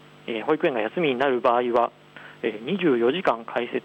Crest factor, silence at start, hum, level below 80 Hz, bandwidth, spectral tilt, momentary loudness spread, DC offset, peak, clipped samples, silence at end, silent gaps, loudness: 16 dB; 0.25 s; none; -70 dBFS; 8.2 kHz; -7 dB/octave; 9 LU; under 0.1%; -8 dBFS; under 0.1%; 0.05 s; none; -24 LUFS